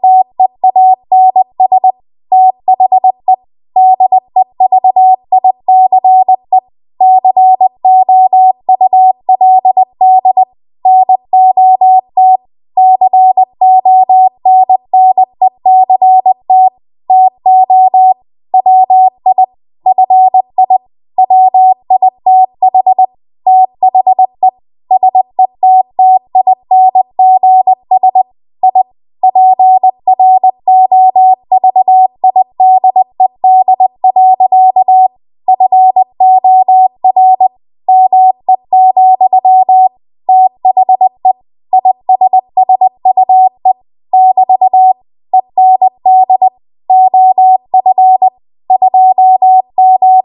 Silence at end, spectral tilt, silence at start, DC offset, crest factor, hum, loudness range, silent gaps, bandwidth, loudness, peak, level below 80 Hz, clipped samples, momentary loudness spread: 0.05 s; -9.5 dB/octave; 0.05 s; under 0.1%; 6 dB; none; 2 LU; none; 1.1 kHz; -7 LUFS; 0 dBFS; -66 dBFS; under 0.1%; 7 LU